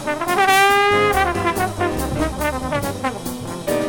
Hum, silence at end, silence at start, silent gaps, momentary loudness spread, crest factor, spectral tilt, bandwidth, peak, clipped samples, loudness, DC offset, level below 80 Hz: none; 0 s; 0 s; none; 12 LU; 14 dB; -4 dB/octave; 18.5 kHz; -6 dBFS; under 0.1%; -18 LUFS; under 0.1%; -36 dBFS